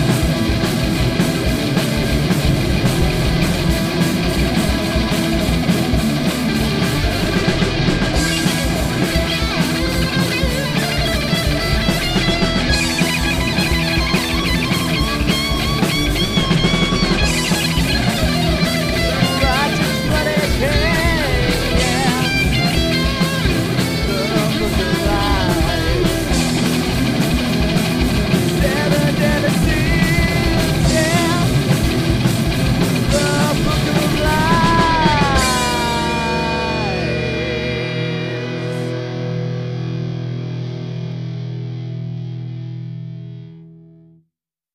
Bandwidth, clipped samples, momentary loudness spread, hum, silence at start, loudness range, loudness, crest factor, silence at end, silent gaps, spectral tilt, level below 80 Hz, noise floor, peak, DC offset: 15.5 kHz; under 0.1%; 8 LU; none; 0 s; 7 LU; -17 LUFS; 14 dB; 1 s; none; -5 dB/octave; -26 dBFS; -75 dBFS; -2 dBFS; under 0.1%